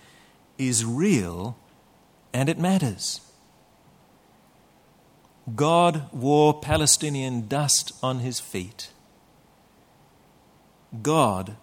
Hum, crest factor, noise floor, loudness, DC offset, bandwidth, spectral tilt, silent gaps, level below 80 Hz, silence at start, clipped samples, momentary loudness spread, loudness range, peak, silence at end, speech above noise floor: none; 20 dB; -58 dBFS; -23 LUFS; under 0.1%; 17 kHz; -4 dB/octave; none; -52 dBFS; 0.6 s; under 0.1%; 17 LU; 8 LU; -6 dBFS; 0.05 s; 34 dB